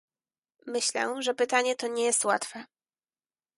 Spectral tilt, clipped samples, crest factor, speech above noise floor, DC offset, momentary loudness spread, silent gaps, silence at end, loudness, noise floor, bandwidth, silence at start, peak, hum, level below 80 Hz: -0.5 dB/octave; under 0.1%; 22 dB; over 62 dB; under 0.1%; 12 LU; none; 0.95 s; -27 LUFS; under -90 dBFS; 12 kHz; 0.65 s; -10 dBFS; none; -84 dBFS